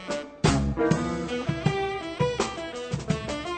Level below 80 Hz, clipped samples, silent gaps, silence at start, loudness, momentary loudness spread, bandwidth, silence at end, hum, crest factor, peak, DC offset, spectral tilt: -40 dBFS; under 0.1%; none; 0 s; -27 LUFS; 8 LU; 9.2 kHz; 0 s; none; 18 dB; -8 dBFS; under 0.1%; -5.5 dB/octave